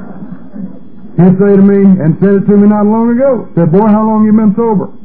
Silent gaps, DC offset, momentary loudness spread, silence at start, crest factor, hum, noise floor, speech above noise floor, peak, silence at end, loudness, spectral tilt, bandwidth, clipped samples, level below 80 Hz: none; 5%; 20 LU; 0 s; 8 dB; none; -31 dBFS; 24 dB; 0 dBFS; 0.15 s; -8 LUFS; -14 dB/octave; 2.8 kHz; 1%; -44 dBFS